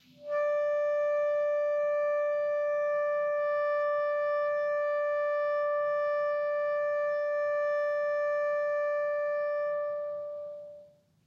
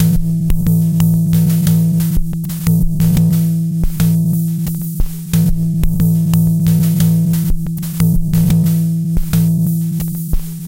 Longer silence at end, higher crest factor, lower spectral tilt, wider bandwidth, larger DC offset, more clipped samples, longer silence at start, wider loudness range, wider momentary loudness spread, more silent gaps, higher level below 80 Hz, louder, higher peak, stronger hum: first, 0.4 s vs 0 s; about the same, 8 dB vs 12 dB; second, -3.5 dB/octave vs -7 dB/octave; second, 6.2 kHz vs 17 kHz; neither; neither; first, 0.2 s vs 0 s; about the same, 2 LU vs 2 LU; second, 4 LU vs 7 LU; neither; second, -84 dBFS vs -22 dBFS; second, -30 LUFS vs -15 LUFS; second, -22 dBFS vs 0 dBFS; neither